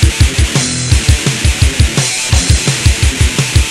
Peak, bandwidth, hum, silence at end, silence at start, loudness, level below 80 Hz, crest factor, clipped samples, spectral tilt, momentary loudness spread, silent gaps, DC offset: 0 dBFS; 14 kHz; none; 0 s; 0 s; -11 LUFS; -14 dBFS; 10 dB; 0.1%; -3.5 dB/octave; 2 LU; none; under 0.1%